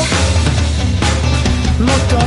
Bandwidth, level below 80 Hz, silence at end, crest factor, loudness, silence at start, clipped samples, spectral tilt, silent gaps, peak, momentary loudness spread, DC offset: 11.5 kHz; -18 dBFS; 0 s; 10 dB; -14 LUFS; 0 s; under 0.1%; -5 dB/octave; none; -2 dBFS; 2 LU; under 0.1%